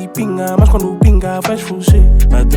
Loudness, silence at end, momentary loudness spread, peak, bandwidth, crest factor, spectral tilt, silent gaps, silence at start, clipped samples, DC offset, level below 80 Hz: -12 LUFS; 0 s; 8 LU; 0 dBFS; 16.5 kHz; 10 dB; -7 dB/octave; none; 0 s; under 0.1%; under 0.1%; -12 dBFS